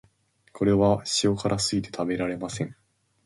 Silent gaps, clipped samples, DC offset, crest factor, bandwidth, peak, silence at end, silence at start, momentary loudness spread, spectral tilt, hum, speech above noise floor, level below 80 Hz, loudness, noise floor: none; under 0.1%; under 0.1%; 18 dB; 11.5 kHz; -8 dBFS; 0.55 s; 0.55 s; 10 LU; -5 dB/octave; none; 40 dB; -52 dBFS; -25 LUFS; -65 dBFS